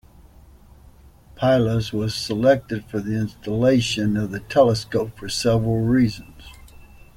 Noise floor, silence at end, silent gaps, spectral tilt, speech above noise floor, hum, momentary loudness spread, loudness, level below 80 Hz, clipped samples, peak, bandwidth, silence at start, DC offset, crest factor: -48 dBFS; 0.3 s; none; -6 dB/octave; 28 dB; none; 8 LU; -21 LUFS; -46 dBFS; under 0.1%; -4 dBFS; 16 kHz; 1.35 s; under 0.1%; 18 dB